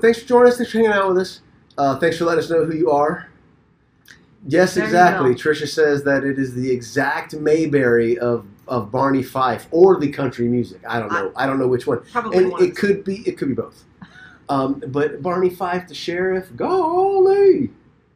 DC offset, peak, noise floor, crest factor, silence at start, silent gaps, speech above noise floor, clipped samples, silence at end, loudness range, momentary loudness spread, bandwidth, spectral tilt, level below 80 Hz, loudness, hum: under 0.1%; 0 dBFS; -57 dBFS; 18 dB; 0.05 s; none; 39 dB; under 0.1%; 0.45 s; 4 LU; 10 LU; 15.5 kHz; -6 dB/octave; -54 dBFS; -18 LUFS; none